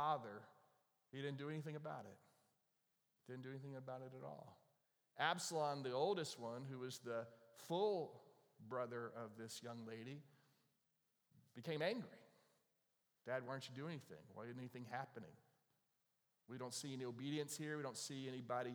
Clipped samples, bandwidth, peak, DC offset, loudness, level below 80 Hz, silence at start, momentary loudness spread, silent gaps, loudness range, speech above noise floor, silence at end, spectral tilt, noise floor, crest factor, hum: under 0.1%; over 20 kHz; -24 dBFS; under 0.1%; -48 LUFS; under -90 dBFS; 0 s; 17 LU; none; 8 LU; 39 dB; 0 s; -4.5 dB/octave; -87 dBFS; 24 dB; none